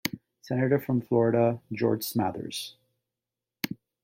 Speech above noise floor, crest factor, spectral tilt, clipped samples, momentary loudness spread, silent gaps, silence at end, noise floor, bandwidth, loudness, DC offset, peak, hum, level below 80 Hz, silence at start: 63 dB; 18 dB; -6 dB/octave; under 0.1%; 12 LU; none; 0.3 s; -89 dBFS; 16.5 kHz; -28 LUFS; under 0.1%; -10 dBFS; none; -66 dBFS; 0.05 s